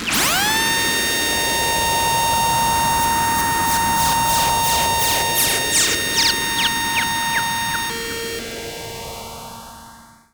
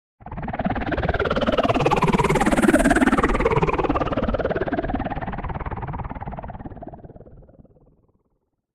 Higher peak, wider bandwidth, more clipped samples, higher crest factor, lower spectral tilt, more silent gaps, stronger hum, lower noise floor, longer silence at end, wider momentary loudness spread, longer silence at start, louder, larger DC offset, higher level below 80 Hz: about the same, -4 dBFS vs -4 dBFS; first, over 20 kHz vs 15 kHz; neither; about the same, 16 dB vs 18 dB; second, -1 dB/octave vs -6 dB/octave; neither; neither; second, -44 dBFS vs -71 dBFS; second, 0.3 s vs 1.35 s; second, 13 LU vs 18 LU; second, 0 s vs 0.25 s; first, -17 LUFS vs -22 LUFS; neither; second, -40 dBFS vs -34 dBFS